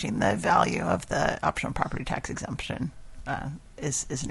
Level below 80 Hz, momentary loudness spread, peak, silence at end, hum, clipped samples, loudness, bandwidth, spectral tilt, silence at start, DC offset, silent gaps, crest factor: -46 dBFS; 12 LU; -6 dBFS; 0 s; none; under 0.1%; -28 LUFS; 11.5 kHz; -4.5 dB/octave; 0 s; under 0.1%; none; 22 dB